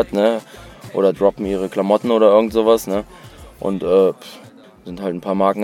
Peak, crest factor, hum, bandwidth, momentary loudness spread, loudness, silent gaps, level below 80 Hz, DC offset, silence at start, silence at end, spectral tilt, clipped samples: 0 dBFS; 18 dB; none; 16.5 kHz; 17 LU; -17 LUFS; none; -46 dBFS; under 0.1%; 0 s; 0 s; -6.5 dB/octave; under 0.1%